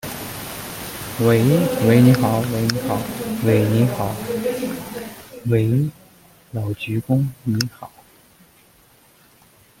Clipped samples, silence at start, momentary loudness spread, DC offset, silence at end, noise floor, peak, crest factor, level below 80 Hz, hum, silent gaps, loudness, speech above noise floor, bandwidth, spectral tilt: under 0.1%; 0.05 s; 15 LU; under 0.1%; 1.95 s; -53 dBFS; 0 dBFS; 20 dB; -50 dBFS; none; none; -20 LUFS; 35 dB; 17 kHz; -6.5 dB/octave